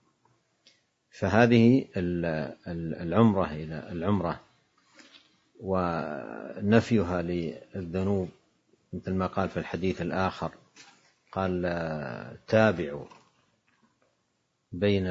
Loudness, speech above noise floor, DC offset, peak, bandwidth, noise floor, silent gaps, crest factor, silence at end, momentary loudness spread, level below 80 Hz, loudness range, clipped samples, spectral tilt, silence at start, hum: -28 LUFS; 48 dB; under 0.1%; -6 dBFS; 7.8 kHz; -76 dBFS; none; 24 dB; 0 s; 15 LU; -60 dBFS; 7 LU; under 0.1%; -7.5 dB/octave; 1.15 s; none